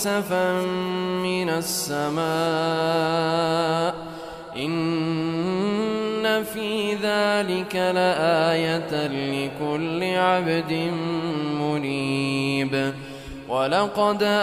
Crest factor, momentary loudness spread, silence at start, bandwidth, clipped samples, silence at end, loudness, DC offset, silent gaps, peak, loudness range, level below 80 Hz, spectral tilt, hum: 16 dB; 6 LU; 0 s; 16 kHz; under 0.1%; 0 s; -23 LUFS; under 0.1%; none; -8 dBFS; 2 LU; -56 dBFS; -5 dB/octave; none